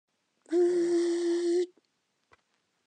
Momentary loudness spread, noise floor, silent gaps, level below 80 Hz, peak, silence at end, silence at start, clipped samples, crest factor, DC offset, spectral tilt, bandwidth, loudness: 6 LU; -77 dBFS; none; under -90 dBFS; -18 dBFS; 1.2 s; 0.5 s; under 0.1%; 12 dB; under 0.1%; -4 dB/octave; 9.2 kHz; -28 LUFS